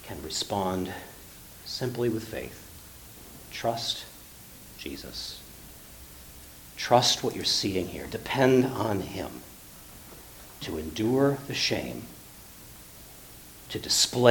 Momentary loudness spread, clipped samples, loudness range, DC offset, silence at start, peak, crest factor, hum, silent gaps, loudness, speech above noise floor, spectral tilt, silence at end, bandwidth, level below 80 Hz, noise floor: 23 LU; under 0.1%; 10 LU; under 0.1%; 0 s; -4 dBFS; 26 dB; none; none; -28 LUFS; 21 dB; -3.5 dB/octave; 0 s; 19 kHz; -54 dBFS; -48 dBFS